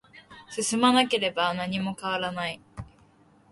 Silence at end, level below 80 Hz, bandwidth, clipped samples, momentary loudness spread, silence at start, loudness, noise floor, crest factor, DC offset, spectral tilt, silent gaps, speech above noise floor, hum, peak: 0.65 s; -60 dBFS; 11.5 kHz; under 0.1%; 18 LU; 0.15 s; -26 LUFS; -59 dBFS; 20 dB; under 0.1%; -3.5 dB/octave; none; 33 dB; none; -8 dBFS